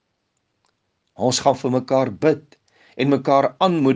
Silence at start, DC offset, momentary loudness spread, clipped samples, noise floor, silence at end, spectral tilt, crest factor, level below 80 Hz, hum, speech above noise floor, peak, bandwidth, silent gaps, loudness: 1.2 s; under 0.1%; 6 LU; under 0.1%; -72 dBFS; 0 s; -5.5 dB/octave; 18 dB; -66 dBFS; none; 54 dB; -2 dBFS; 10 kHz; none; -19 LUFS